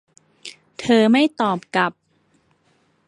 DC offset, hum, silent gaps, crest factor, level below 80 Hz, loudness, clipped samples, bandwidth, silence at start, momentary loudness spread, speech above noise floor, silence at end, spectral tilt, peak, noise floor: under 0.1%; none; none; 18 dB; -66 dBFS; -18 LUFS; under 0.1%; 11 kHz; 0.45 s; 24 LU; 45 dB; 1.15 s; -5 dB/octave; -2 dBFS; -62 dBFS